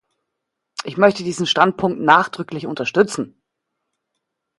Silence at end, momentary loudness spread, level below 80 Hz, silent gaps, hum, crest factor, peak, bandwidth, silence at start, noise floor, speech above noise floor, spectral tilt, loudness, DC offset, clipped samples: 1.3 s; 14 LU; -62 dBFS; none; none; 20 dB; 0 dBFS; 11.5 kHz; 0.8 s; -79 dBFS; 61 dB; -4.5 dB/octave; -18 LUFS; under 0.1%; under 0.1%